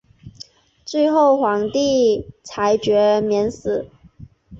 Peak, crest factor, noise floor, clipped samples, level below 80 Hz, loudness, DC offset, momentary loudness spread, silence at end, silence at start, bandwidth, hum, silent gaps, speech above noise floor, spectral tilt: -4 dBFS; 14 dB; -44 dBFS; under 0.1%; -52 dBFS; -18 LUFS; under 0.1%; 20 LU; 0 s; 0.25 s; 7.8 kHz; none; none; 27 dB; -5 dB/octave